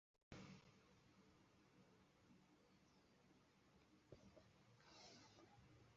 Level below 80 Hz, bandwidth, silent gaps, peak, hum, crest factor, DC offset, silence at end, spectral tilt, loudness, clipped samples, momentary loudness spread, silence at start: -84 dBFS; 7.4 kHz; 0.23-0.31 s; -42 dBFS; none; 28 dB; under 0.1%; 0 s; -4.5 dB/octave; -66 LUFS; under 0.1%; 7 LU; 0.15 s